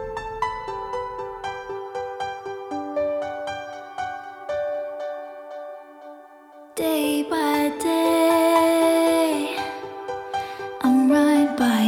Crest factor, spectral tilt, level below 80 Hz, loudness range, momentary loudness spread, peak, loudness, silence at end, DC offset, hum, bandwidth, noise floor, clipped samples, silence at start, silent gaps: 16 dB; -4 dB/octave; -56 dBFS; 10 LU; 17 LU; -6 dBFS; -23 LUFS; 0 s; under 0.1%; none; 18 kHz; -46 dBFS; under 0.1%; 0 s; none